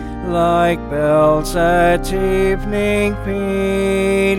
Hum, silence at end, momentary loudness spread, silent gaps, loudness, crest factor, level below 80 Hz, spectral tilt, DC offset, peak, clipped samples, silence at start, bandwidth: none; 0 s; 5 LU; none; -16 LUFS; 12 dB; -28 dBFS; -6 dB/octave; under 0.1%; -2 dBFS; under 0.1%; 0 s; 16.5 kHz